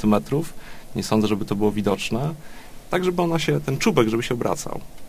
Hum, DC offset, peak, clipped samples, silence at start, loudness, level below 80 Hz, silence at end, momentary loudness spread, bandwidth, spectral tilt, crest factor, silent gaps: none; under 0.1%; -4 dBFS; under 0.1%; 0 s; -23 LUFS; -46 dBFS; 0 s; 13 LU; 15.5 kHz; -5.5 dB/octave; 20 dB; none